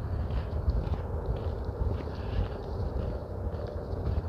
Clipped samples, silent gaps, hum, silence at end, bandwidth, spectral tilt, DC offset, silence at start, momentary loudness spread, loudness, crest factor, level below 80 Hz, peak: under 0.1%; none; none; 0 s; 6 kHz; -9 dB/octave; under 0.1%; 0 s; 4 LU; -34 LUFS; 16 dB; -36 dBFS; -16 dBFS